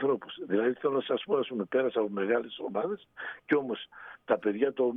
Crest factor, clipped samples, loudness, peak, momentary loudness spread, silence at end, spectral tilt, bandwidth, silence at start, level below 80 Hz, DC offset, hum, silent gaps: 18 dB; under 0.1%; -30 LUFS; -12 dBFS; 10 LU; 0 s; -8.5 dB/octave; 3.9 kHz; 0 s; -76 dBFS; under 0.1%; none; none